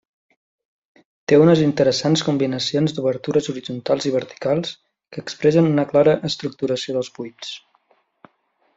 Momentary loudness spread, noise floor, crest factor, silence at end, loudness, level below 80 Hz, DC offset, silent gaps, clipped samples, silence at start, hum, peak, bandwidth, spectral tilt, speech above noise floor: 17 LU; -65 dBFS; 18 dB; 1.2 s; -19 LUFS; -60 dBFS; under 0.1%; none; under 0.1%; 1.3 s; none; -4 dBFS; 7.8 kHz; -6 dB/octave; 46 dB